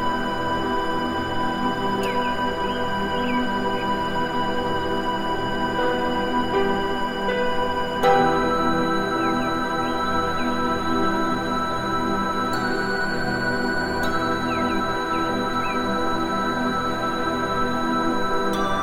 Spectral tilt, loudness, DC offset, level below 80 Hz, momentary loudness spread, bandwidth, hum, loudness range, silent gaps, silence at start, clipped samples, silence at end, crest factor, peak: -5 dB/octave; -23 LUFS; under 0.1%; -40 dBFS; 3 LU; 16.5 kHz; none; 2 LU; none; 0 s; under 0.1%; 0 s; 18 dB; -6 dBFS